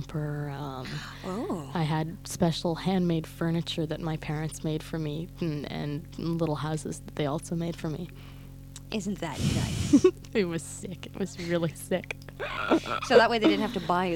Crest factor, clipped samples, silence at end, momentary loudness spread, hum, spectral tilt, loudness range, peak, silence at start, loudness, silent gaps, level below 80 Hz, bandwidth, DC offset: 22 dB; under 0.1%; 0 s; 14 LU; none; -5.5 dB/octave; 6 LU; -6 dBFS; 0 s; -29 LUFS; none; -48 dBFS; 18 kHz; under 0.1%